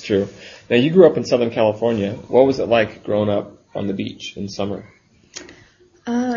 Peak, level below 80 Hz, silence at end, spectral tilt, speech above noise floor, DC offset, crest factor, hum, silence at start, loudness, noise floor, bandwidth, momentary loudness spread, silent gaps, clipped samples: 0 dBFS; -56 dBFS; 0 s; -6.5 dB/octave; 33 dB; under 0.1%; 18 dB; none; 0 s; -18 LUFS; -51 dBFS; 7.4 kHz; 21 LU; none; under 0.1%